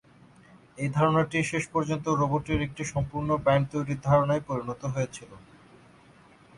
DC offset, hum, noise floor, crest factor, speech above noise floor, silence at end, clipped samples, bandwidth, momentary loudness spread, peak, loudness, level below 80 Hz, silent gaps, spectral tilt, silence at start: under 0.1%; none; -55 dBFS; 20 dB; 29 dB; 1.2 s; under 0.1%; 11.5 kHz; 9 LU; -8 dBFS; -27 LUFS; -50 dBFS; none; -6.5 dB/octave; 0.75 s